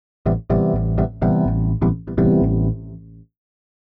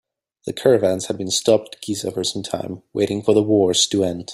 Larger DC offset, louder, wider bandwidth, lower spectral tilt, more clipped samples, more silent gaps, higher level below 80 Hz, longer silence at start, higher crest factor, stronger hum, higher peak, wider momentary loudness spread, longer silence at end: neither; about the same, -19 LUFS vs -19 LUFS; second, 3.5 kHz vs 15 kHz; first, -13 dB/octave vs -4 dB/octave; neither; neither; first, -30 dBFS vs -58 dBFS; second, 0.25 s vs 0.45 s; second, 10 dB vs 18 dB; neither; second, -8 dBFS vs -2 dBFS; second, 7 LU vs 12 LU; first, 0.6 s vs 0 s